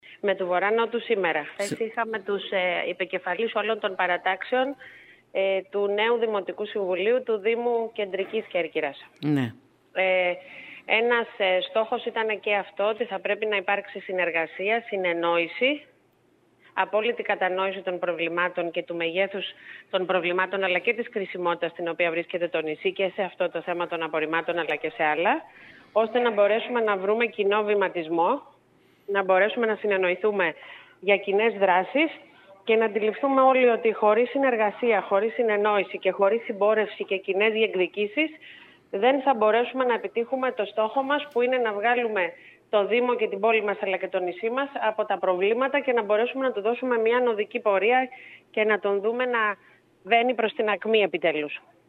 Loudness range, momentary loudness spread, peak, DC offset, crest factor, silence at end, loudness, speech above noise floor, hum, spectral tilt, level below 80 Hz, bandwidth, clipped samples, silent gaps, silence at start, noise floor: 4 LU; 8 LU; -6 dBFS; under 0.1%; 18 dB; 0.3 s; -25 LUFS; 38 dB; none; -5.5 dB/octave; -80 dBFS; 10.5 kHz; under 0.1%; none; 0.1 s; -63 dBFS